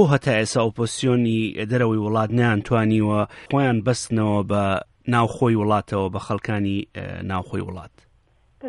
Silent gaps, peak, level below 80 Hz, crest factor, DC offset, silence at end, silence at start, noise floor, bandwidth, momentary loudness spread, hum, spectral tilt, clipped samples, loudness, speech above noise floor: none; -4 dBFS; -52 dBFS; 18 dB; under 0.1%; 0 s; 0 s; -59 dBFS; 11.5 kHz; 8 LU; none; -6.5 dB/octave; under 0.1%; -22 LUFS; 38 dB